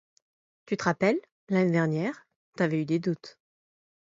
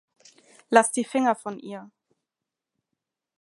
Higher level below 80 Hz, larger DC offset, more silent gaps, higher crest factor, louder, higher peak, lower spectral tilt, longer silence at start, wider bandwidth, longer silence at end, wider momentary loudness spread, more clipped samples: first, -72 dBFS vs -80 dBFS; neither; first, 1.31-1.47 s, 2.36-2.52 s vs none; about the same, 22 dB vs 26 dB; second, -28 LUFS vs -23 LUFS; second, -8 dBFS vs -2 dBFS; first, -7 dB/octave vs -3 dB/octave; about the same, 0.7 s vs 0.7 s; second, 7.8 kHz vs 11.5 kHz; second, 0.75 s vs 1.55 s; second, 9 LU vs 19 LU; neither